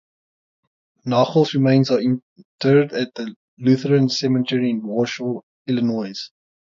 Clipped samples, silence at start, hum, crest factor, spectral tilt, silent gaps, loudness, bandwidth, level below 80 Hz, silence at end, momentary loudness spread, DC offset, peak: under 0.1%; 1.05 s; none; 18 dB; -6.5 dB/octave; 2.22-2.36 s, 2.45-2.59 s, 3.36-3.57 s, 5.43-5.65 s; -20 LUFS; 7.4 kHz; -66 dBFS; 0.45 s; 14 LU; under 0.1%; -2 dBFS